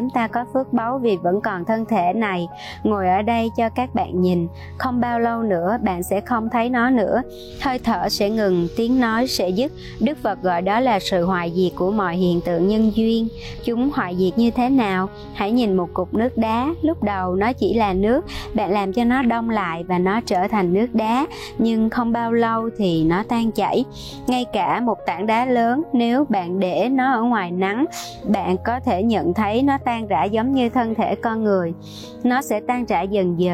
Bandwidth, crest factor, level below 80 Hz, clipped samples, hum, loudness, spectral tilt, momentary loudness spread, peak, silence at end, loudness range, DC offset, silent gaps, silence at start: 15.5 kHz; 12 dB; -44 dBFS; under 0.1%; none; -20 LUFS; -6.5 dB/octave; 5 LU; -8 dBFS; 0 s; 1 LU; under 0.1%; none; 0 s